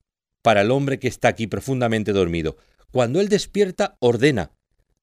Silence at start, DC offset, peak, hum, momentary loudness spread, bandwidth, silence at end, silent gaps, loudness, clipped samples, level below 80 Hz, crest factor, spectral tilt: 0.45 s; under 0.1%; -4 dBFS; none; 9 LU; 15.5 kHz; 0.55 s; none; -21 LUFS; under 0.1%; -48 dBFS; 18 dB; -5.5 dB/octave